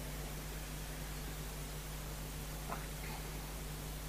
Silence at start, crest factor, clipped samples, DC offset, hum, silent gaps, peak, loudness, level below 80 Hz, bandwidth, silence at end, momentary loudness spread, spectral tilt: 0 s; 16 dB; under 0.1%; under 0.1%; none; none; -26 dBFS; -45 LUFS; -46 dBFS; 15.5 kHz; 0 s; 1 LU; -4 dB/octave